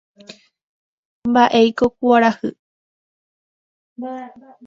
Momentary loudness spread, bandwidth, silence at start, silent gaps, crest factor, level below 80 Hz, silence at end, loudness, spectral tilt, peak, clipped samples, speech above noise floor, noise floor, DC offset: 17 LU; 7.4 kHz; 0.3 s; 0.64-1.22 s, 2.59-3.96 s; 20 dB; -58 dBFS; 0.4 s; -16 LUFS; -5.5 dB/octave; 0 dBFS; under 0.1%; 28 dB; -44 dBFS; under 0.1%